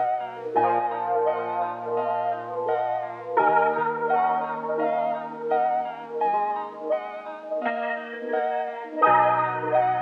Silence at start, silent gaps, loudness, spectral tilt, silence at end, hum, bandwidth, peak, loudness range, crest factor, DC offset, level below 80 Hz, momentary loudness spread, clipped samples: 0 s; none; -25 LUFS; -7.5 dB/octave; 0 s; none; 5.4 kHz; -6 dBFS; 3 LU; 18 dB; under 0.1%; -86 dBFS; 9 LU; under 0.1%